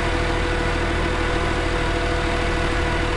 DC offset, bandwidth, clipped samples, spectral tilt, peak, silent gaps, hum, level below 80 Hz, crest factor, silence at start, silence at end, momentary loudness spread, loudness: 0.6%; 11.5 kHz; under 0.1%; -5 dB/octave; -8 dBFS; none; none; -26 dBFS; 12 dB; 0 s; 0 s; 0 LU; -22 LUFS